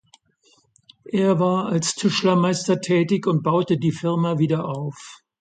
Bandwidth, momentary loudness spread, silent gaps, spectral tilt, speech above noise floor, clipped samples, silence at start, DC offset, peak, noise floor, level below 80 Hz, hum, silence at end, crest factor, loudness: 9.4 kHz; 9 LU; none; -5.5 dB/octave; 40 dB; under 0.1%; 1.05 s; under 0.1%; -6 dBFS; -61 dBFS; -64 dBFS; none; 0.25 s; 14 dB; -21 LUFS